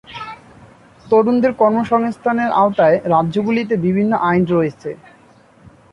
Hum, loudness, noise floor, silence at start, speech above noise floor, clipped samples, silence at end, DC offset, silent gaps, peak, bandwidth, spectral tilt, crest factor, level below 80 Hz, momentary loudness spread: none; -16 LUFS; -48 dBFS; 0.1 s; 33 dB; under 0.1%; 0.95 s; under 0.1%; none; -2 dBFS; 9.6 kHz; -8.5 dB/octave; 14 dB; -52 dBFS; 17 LU